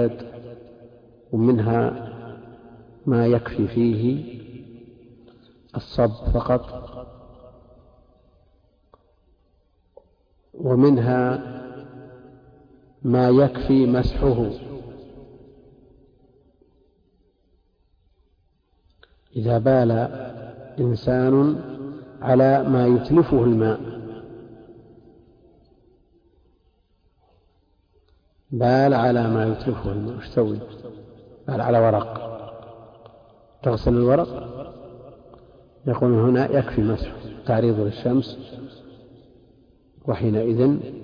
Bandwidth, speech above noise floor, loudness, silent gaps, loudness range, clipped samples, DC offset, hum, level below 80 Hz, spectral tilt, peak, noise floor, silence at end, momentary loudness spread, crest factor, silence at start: 5.2 kHz; 44 dB; -21 LUFS; none; 7 LU; under 0.1%; under 0.1%; none; -42 dBFS; -10.5 dB/octave; -6 dBFS; -64 dBFS; 0 s; 23 LU; 16 dB; 0 s